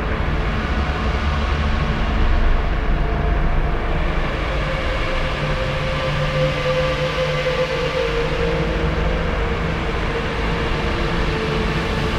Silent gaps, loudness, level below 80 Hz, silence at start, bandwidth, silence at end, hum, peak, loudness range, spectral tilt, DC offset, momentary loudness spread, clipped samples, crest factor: none; -21 LUFS; -22 dBFS; 0 s; 10.5 kHz; 0 s; none; -6 dBFS; 2 LU; -6 dB/octave; under 0.1%; 3 LU; under 0.1%; 14 dB